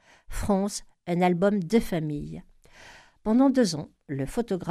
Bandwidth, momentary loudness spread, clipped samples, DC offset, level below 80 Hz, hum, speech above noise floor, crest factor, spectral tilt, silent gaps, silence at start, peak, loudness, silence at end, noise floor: 14.5 kHz; 14 LU; under 0.1%; under 0.1%; -46 dBFS; none; 26 dB; 18 dB; -6 dB/octave; none; 0.3 s; -8 dBFS; -26 LUFS; 0 s; -51 dBFS